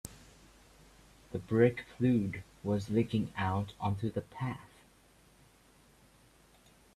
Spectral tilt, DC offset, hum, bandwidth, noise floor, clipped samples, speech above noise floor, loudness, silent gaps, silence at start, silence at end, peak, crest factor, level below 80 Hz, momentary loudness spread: -7.5 dB/octave; under 0.1%; none; 15 kHz; -63 dBFS; under 0.1%; 31 dB; -33 LUFS; none; 0.05 s; 2.3 s; -12 dBFS; 22 dB; -62 dBFS; 14 LU